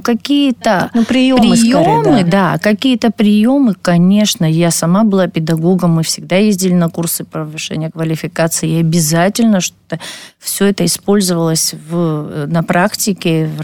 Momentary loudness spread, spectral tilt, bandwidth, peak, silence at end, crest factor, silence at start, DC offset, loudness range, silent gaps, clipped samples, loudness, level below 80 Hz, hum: 9 LU; -5 dB/octave; 19 kHz; -2 dBFS; 0 s; 10 dB; 0 s; under 0.1%; 4 LU; none; under 0.1%; -12 LUFS; -48 dBFS; none